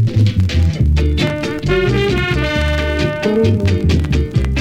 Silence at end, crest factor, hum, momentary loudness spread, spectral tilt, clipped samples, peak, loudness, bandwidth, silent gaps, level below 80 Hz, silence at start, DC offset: 0 s; 12 dB; none; 3 LU; -7 dB/octave; under 0.1%; -2 dBFS; -15 LUFS; 10.5 kHz; none; -20 dBFS; 0 s; under 0.1%